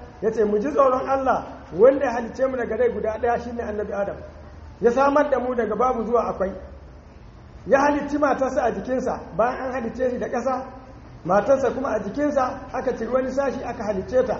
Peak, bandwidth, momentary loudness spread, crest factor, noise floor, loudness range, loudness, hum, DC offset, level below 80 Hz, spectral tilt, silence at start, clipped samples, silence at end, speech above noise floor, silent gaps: -4 dBFS; 7.2 kHz; 10 LU; 18 dB; -44 dBFS; 3 LU; -23 LUFS; none; under 0.1%; -46 dBFS; -5.5 dB/octave; 0 s; under 0.1%; 0 s; 22 dB; none